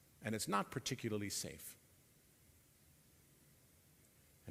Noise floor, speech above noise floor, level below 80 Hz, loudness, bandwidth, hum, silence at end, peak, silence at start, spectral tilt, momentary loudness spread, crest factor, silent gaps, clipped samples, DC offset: -69 dBFS; 27 dB; -74 dBFS; -42 LUFS; 16 kHz; none; 0 s; -22 dBFS; 0.2 s; -3.5 dB/octave; 16 LU; 26 dB; none; under 0.1%; under 0.1%